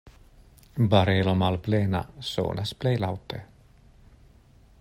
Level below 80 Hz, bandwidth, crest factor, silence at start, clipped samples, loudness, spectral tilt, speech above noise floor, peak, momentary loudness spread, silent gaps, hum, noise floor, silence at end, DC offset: -52 dBFS; 15.5 kHz; 22 dB; 0.05 s; under 0.1%; -26 LUFS; -7 dB/octave; 30 dB; -6 dBFS; 15 LU; none; none; -55 dBFS; 1.35 s; under 0.1%